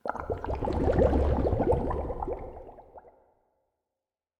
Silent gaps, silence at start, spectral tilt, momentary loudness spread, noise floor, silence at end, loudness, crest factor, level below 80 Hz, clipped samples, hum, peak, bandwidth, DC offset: none; 0.05 s; -9.5 dB/octave; 17 LU; under -90 dBFS; 1.3 s; -29 LUFS; 20 dB; -36 dBFS; under 0.1%; none; -10 dBFS; 8.2 kHz; under 0.1%